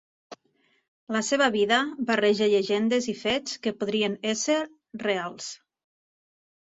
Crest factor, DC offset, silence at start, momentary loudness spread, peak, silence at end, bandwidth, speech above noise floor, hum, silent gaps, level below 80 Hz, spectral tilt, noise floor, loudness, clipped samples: 20 dB; under 0.1%; 0.3 s; 11 LU; -6 dBFS; 1.2 s; 8 kHz; 43 dB; none; 0.88-1.07 s; -68 dBFS; -3 dB/octave; -68 dBFS; -25 LUFS; under 0.1%